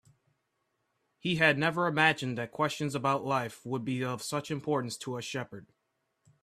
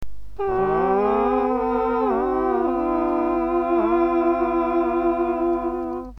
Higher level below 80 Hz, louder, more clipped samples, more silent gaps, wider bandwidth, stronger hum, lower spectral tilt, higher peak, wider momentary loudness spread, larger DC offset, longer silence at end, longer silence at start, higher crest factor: second, -70 dBFS vs -42 dBFS; second, -30 LUFS vs -21 LUFS; neither; neither; first, 14.5 kHz vs 5.8 kHz; second, none vs 50 Hz at -45 dBFS; second, -5 dB/octave vs -8.5 dB/octave; about the same, -8 dBFS vs -8 dBFS; first, 12 LU vs 4 LU; neither; first, 0.8 s vs 0.05 s; first, 1.25 s vs 0 s; first, 24 dB vs 12 dB